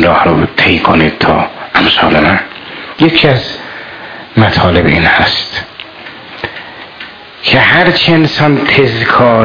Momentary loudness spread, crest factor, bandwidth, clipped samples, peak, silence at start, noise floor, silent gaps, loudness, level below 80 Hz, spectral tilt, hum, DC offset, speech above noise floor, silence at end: 19 LU; 10 dB; 5.4 kHz; 0.5%; 0 dBFS; 0 s; -29 dBFS; none; -8 LUFS; -34 dBFS; -7 dB/octave; none; under 0.1%; 21 dB; 0 s